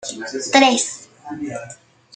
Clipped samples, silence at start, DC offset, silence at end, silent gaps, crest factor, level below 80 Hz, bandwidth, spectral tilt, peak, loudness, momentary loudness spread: under 0.1%; 0 s; under 0.1%; 0.4 s; none; 20 dB; -66 dBFS; 9.6 kHz; -2 dB/octave; 0 dBFS; -18 LUFS; 21 LU